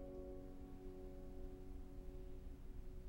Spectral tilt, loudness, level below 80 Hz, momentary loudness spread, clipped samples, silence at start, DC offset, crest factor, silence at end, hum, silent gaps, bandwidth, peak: -8 dB/octave; -56 LUFS; -54 dBFS; 3 LU; under 0.1%; 0 s; under 0.1%; 12 dB; 0 s; none; none; 16 kHz; -38 dBFS